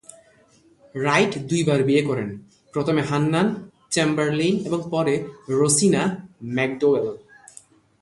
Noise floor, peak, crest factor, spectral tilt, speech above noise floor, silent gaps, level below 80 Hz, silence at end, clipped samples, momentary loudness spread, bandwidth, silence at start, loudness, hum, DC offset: -56 dBFS; -4 dBFS; 18 dB; -5 dB/octave; 35 dB; none; -60 dBFS; 0.85 s; under 0.1%; 12 LU; 11.5 kHz; 0.95 s; -22 LUFS; none; under 0.1%